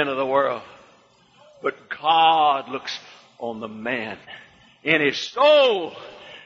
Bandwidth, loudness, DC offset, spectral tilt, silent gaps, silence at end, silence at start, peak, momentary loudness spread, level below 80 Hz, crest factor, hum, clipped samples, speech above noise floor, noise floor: 7.4 kHz; -21 LUFS; under 0.1%; -4 dB/octave; none; 0.05 s; 0 s; -2 dBFS; 18 LU; -68 dBFS; 20 dB; none; under 0.1%; 35 dB; -56 dBFS